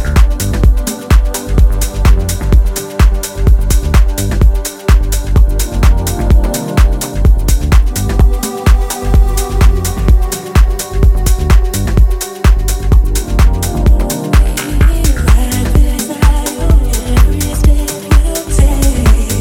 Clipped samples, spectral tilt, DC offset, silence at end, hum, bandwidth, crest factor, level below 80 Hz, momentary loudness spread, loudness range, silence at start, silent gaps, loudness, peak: 0.3%; -5.5 dB/octave; under 0.1%; 0 s; none; 17 kHz; 10 dB; -10 dBFS; 3 LU; 1 LU; 0 s; none; -12 LUFS; 0 dBFS